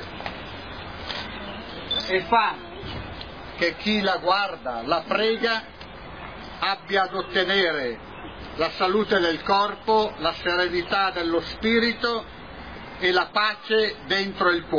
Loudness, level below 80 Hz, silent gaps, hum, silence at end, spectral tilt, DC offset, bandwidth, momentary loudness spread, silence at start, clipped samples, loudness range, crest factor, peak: -23 LUFS; -48 dBFS; none; none; 0 s; -5 dB/octave; 0.2%; 5.4 kHz; 16 LU; 0 s; under 0.1%; 3 LU; 18 dB; -8 dBFS